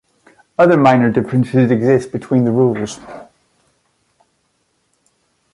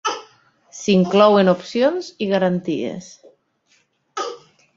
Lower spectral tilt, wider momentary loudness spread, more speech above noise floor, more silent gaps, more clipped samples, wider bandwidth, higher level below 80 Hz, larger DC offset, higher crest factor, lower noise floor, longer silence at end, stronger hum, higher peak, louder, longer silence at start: first, -8 dB/octave vs -5.5 dB/octave; second, 16 LU vs 19 LU; first, 51 dB vs 45 dB; neither; neither; first, 11.5 kHz vs 7.8 kHz; first, -54 dBFS vs -64 dBFS; neither; about the same, 16 dB vs 18 dB; about the same, -64 dBFS vs -62 dBFS; first, 2.3 s vs 0.4 s; neither; about the same, -2 dBFS vs -2 dBFS; first, -14 LUFS vs -18 LUFS; first, 0.6 s vs 0.05 s